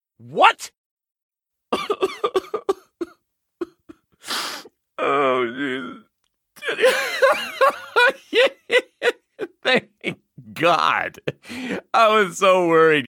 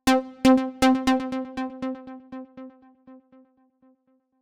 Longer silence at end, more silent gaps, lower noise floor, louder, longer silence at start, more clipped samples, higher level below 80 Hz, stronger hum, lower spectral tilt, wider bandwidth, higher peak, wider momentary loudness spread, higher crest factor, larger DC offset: second, 0 s vs 1.25 s; first, 0.78-0.97 s, 1.23-1.29 s vs none; first, -72 dBFS vs -66 dBFS; first, -20 LUFS vs -23 LUFS; first, 0.25 s vs 0.05 s; neither; second, -68 dBFS vs -52 dBFS; neither; about the same, -3.5 dB/octave vs -4 dB/octave; first, 18.5 kHz vs 16 kHz; first, 0 dBFS vs -6 dBFS; second, 19 LU vs 22 LU; about the same, 22 dB vs 20 dB; neither